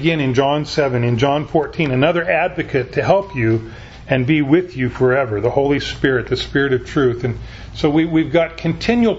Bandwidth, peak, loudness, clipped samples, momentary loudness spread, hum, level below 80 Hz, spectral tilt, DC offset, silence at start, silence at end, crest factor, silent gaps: 8 kHz; 0 dBFS; -17 LUFS; under 0.1%; 5 LU; none; -38 dBFS; -7 dB/octave; under 0.1%; 0 s; 0 s; 16 dB; none